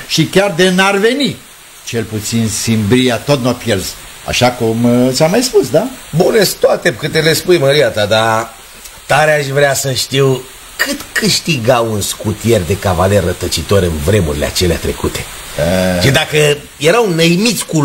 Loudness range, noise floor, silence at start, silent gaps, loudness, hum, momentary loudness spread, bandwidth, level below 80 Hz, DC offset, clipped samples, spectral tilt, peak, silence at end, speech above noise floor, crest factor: 2 LU; -34 dBFS; 0 s; none; -12 LUFS; none; 8 LU; 16.5 kHz; -34 dBFS; under 0.1%; under 0.1%; -4.5 dB/octave; 0 dBFS; 0 s; 22 dB; 12 dB